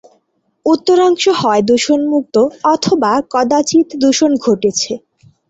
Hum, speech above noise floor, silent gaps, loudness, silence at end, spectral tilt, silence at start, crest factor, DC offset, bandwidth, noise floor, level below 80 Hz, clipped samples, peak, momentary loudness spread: none; 49 dB; none; -13 LUFS; 0.5 s; -4 dB/octave; 0.65 s; 12 dB; under 0.1%; 8.2 kHz; -62 dBFS; -56 dBFS; under 0.1%; -2 dBFS; 4 LU